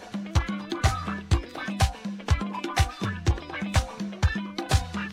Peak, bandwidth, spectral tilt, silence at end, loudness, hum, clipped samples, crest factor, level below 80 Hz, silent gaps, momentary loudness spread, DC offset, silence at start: -8 dBFS; 15.5 kHz; -5 dB/octave; 0 s; -28 LUFS; none; under 0.1%; 20 dB; -32 dBFS; none; 5 LU; under 0.1%; 0 s